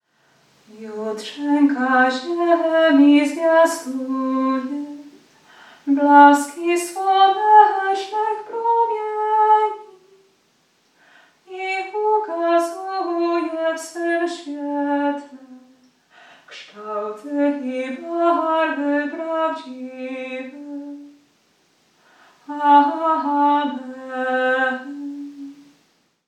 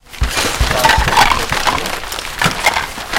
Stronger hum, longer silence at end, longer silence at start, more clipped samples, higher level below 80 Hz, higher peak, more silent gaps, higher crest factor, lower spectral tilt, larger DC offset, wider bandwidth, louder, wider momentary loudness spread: neither; first, 0.75 s vs 0 s; first, 0.75 s vs 0.1 s; neither; second, -86 dBFS vs -24 dBFS; about the same, 0 dBFS vs 0 dBFS; neither; about the same, 20 dB vs 16 dB; about the same, -3 dB/octave vs -2.5 dB/octave; neither; second, 13.5 kHz vs 17.5 kHz; second, -19 LUFS vs -14 LUFS; first, 20 LU vs 9 LU